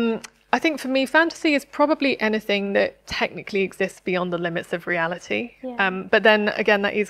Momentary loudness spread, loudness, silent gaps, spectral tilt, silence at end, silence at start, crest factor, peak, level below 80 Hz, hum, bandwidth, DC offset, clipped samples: 8 LU; -22 LUFS; none; -5 dB/octave; 0 s; 0 s; 22 dB; 0 dBFS; -58 dBFS; none; 15 kHz; under 0.1%; under 0.1%